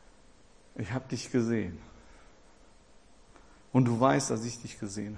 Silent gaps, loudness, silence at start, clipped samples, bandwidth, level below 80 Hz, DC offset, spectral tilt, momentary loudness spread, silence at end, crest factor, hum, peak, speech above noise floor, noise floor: none; -30 LUFS; 0.75 s; under 0.1%; 10.5 kHz; -60 dBFS; under 0.1%; -6 dB/octave; 15 LU; 0 s; 24 dB; none; -8 dBFS; 30 dB; -60 dBFS